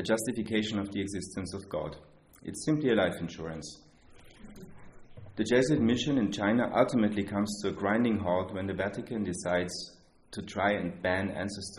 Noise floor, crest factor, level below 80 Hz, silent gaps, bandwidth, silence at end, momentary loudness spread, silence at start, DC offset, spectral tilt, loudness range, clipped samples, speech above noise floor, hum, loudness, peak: -54 dBFS; 20 dB; -60 dBFS; none; 11.5 kHz; 0 s; 16 LU; 0 s; under 0.1%; -5.5 dB/octave; 6 LU; under 0.1%; 24 dB; none; -30 LUFS; -10 dBFS